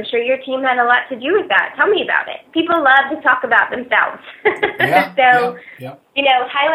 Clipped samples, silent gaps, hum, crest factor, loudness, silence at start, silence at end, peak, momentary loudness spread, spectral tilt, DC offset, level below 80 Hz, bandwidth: under 0.1%; none; none; 16 dB; -15 LUFS; 0 s; 0 s; 0 dBFS; 9 LU; -5 dB/octave; under 0.1%; -62 dBFS; 14 kHz